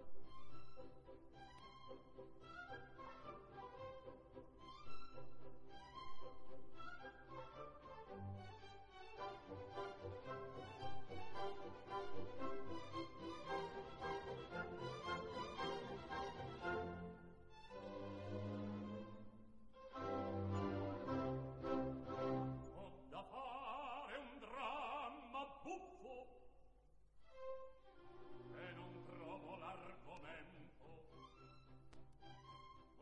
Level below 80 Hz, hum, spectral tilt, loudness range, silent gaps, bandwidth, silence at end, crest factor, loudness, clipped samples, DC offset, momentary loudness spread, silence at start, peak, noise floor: -70 dBFS; none; -6.5 dB/octave; 12 LU; none; 10.5 kHz; 0 s; 18 dB; -51 LUFS; under 0.1%; under 0.1%; 17 LU; 0 s; -32 dBFS; -68 dBFS